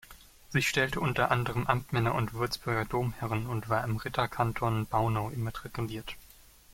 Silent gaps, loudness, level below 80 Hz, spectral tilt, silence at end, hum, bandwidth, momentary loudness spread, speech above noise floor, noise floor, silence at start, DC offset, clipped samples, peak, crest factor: none; -31 LUFS; -50 dBFS; -5.5 dB/octave; 0.45 s; none; 16.5 kHz; 9 LU; 25 dB; -56 dBFS; 0.1 s; under 0.1%; under 0.1%; -8 dBFS; 22 dB